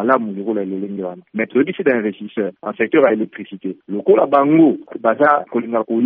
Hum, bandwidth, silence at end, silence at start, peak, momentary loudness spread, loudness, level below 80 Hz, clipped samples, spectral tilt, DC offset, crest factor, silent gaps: none; 3.8 kHz; 0 s; 0 s; 0 dBFS; 13 LU; -17 LUFS; -68 dBFS; under 0.1%; -5.5 dB/octave; under 0.1%; 16 dB; none